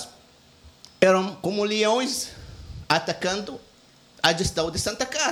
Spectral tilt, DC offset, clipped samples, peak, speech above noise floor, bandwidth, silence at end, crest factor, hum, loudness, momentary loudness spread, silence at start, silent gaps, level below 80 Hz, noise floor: -3 dB/octave; under 0.1%; under 0.1%; -4 dBFS; 31 dB; 19 kHz; 0 s; 20 dB; none; -24 LUFS; 21 LU; 0 s; none; -48 dBFS; -54 dBFS